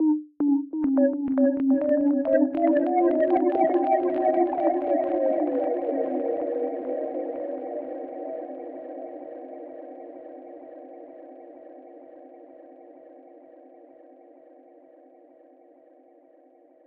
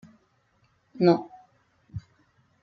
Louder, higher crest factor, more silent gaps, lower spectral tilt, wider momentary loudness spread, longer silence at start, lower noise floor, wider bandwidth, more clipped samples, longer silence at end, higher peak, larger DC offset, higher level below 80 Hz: about the same, -24 LUFS vs -24 LUFS; second, 16 dB vs 22 dB; neither; first, -10 dB/octave vs -7 dB/octave; about the same, 22 LU vs 21 LU; second, 0 s vs 0.95 s; second, -56 dBFS vs -67 dBFS; second, 3.6 kHz vs 6 kHz; neither; first, 3.25 s vs 0.65 s; about the same, -10 dBFS vs -8 dBFS; neither; second, -70 dBFS vs -62 dBFS